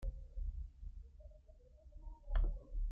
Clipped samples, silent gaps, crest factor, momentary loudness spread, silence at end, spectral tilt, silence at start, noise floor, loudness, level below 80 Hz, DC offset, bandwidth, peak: under 0.1%; none; 18 dB; 21 LU; 0 s; -8 dB/octave; 0 s; -62 dBFS; -47 LUFS; -42 dBFS; under 0.1%; 3.5 kHz; -26 dBFS